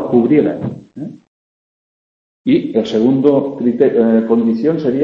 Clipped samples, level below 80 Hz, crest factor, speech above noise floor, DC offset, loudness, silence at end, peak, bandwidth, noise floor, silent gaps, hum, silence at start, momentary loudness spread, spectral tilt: under 0.1%; -54 dBFS; 14 dB; over 77 dB; under 0.1%; -14 LUFS; 0 s; 0 dBFS; 7.2 kHz; under -90 dBFS; 1.27-2.45 s; none; 0 s; 16 LU; -8.5 dB/octave